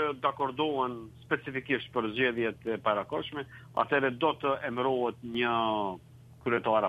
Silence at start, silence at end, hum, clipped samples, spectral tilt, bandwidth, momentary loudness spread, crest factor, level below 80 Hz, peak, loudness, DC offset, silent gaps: 0 s; 0 s; none; under 0.1%; -7 dB/octave; 13 kHz; 8 LU; 20 dB; -64 dBFS; -10 dBFS; -31 LUFS; under 0.1%; none